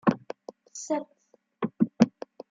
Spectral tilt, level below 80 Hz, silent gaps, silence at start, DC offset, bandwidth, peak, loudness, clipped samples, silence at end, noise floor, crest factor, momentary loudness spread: -6.5 dB/octave; -70 dBFS; none; 0.05 s; under 0.1%; 7.8 kHz; -4 dBFS; -29 LUFS; under 0.1%; 0.45 s; -44 dBFS; 24 dB; 19 LU